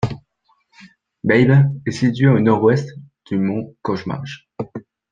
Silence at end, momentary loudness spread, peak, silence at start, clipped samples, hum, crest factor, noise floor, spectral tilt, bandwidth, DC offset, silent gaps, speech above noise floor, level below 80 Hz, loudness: 0.3 s; 17 LU; -2 dBFS; 0 s; under 0.1%; none; 18 dB; -63 dBFS; -8 dB/octave; 7.4 kHz; under 0.1%; none; 47 dB; -52 dBFS; -17 LUFS